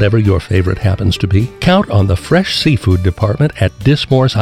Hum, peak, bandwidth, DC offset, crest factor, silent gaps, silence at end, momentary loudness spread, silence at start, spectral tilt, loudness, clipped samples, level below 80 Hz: none; 0 dBFS; 12 kHz; under 0.1%; 12 dB; none; 0 s; 3 LU; 0 s; -7 dB/octave; -13 LUFS; under 0.1%; -30 dBFS